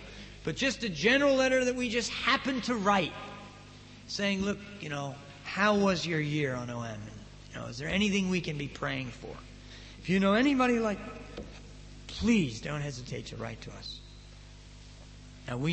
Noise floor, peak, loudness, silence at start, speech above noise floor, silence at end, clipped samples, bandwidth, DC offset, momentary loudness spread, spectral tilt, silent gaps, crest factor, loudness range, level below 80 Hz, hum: -50 dBFS; -12 dBFS; -30 LUFS; 0 s; 20 dB; 0 s; under 0.1%; 8.8 kHz; under 0.1%; 23 LU; -5 dB/octave; none; 20 dB; 7 LU; -52 dBFS; 50 Hz at -50 dBFS